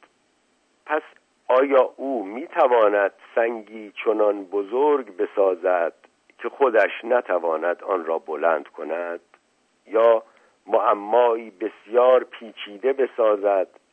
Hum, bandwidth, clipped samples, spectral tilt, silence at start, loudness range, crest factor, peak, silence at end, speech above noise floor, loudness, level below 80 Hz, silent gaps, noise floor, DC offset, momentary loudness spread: none; 4 kHz; under 0.1%; -5.5 dB/octave; 0.85 s; 3 LU; 16 dB; -6 dBFS; 0.3 s; 44 dB; -22 LUFS; -86 dBFS; none; -65 dBFS; under 0.1%; 13 LU